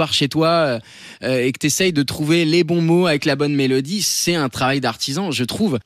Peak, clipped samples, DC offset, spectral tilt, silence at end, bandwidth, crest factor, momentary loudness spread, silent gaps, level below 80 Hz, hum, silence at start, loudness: -6 dBFS; under 0.1%; under 0.1%; -4.5 dB/octave; 0.05 s; 14.5 kHz; 12 dB; 6 LU; none; -56 dBFS; none; 0 s; -18 LUFS